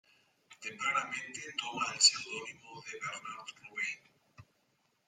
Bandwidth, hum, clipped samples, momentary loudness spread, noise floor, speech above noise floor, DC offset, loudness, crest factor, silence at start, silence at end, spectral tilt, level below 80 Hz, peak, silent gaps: 14 kHz; none; under 0.1%; 21 LU; -76 dBFS; 40 dB; under 0.1%; -33 LUFS; 28 dB; 0.5 s; 0.65 s; 1 dB/octave; -82 dBFS; -10 dBFS; none